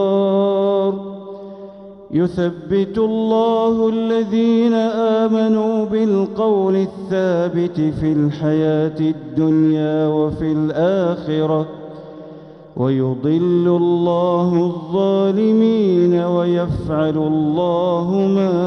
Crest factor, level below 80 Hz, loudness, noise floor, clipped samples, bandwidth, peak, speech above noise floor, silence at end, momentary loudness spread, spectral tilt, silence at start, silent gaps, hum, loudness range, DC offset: 12 dB; -48 dBFS; -17 LUFS; -38 dBFS; under 0.1%; 6.6 kHz; -4 dBFS; 22 dB; 0 s; 7 LU; -9 dB/octave; 0 s; none; none; 3 LU; under 0.1%